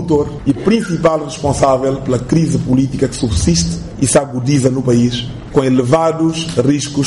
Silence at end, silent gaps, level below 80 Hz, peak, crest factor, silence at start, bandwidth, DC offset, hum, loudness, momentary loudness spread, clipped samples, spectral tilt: 0 s; none; -32 dBFS; 0 dBFS; 12 dB; 0 s; 11.5 kHz; under 0.1%; none; -14 LUFS; 5 LU; under 0.1%; -5.5 dB/octave